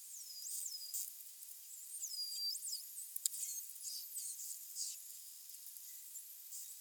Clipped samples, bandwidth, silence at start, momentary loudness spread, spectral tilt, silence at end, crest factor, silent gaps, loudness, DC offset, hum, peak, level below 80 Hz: under 0.1%; 19 kHz; 0 s; 10 LU; 8 dB/octave; 0 s; 34 dB; none; -44 LUFS; under 0.1%; none; -12 dBFS; under -90 dBFS